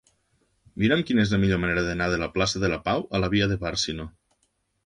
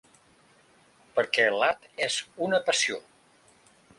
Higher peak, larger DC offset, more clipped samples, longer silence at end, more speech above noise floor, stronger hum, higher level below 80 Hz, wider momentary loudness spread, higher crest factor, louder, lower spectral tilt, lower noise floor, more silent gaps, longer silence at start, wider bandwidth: about the same, -8 dBFS vs -8 dBFS; neither; neither; second, 0.75 s vs 1 s; first, 48 dB vs 34 dB; neither; first, -44 dBFS vs -74 dBFS; about the same, 6 LU vs 7 LU; about the same, 18 dB vs 22 dB; about the same, -24 LUFS vs -26 LUFS; first, -5 dB/octave vs -1.5 dB/octave; first, -72 dBFS vs -61 dBFS; neither; second, 0.75 s vs 1.15 s; about the same, 11.5 kHz vs 11.5 kHz